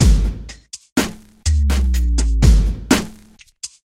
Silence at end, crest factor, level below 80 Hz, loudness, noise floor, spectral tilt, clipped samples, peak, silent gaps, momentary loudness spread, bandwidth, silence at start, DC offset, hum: 0.25 s; 16 dB; -18 dBFS; -18 LUFS; -46 dBFS; -5 dB/octave; under 0.1%; 0 dBFS; 0.92-0.96 s; 19 LU; 15.5 kHz; 0 s; under 0.1%; none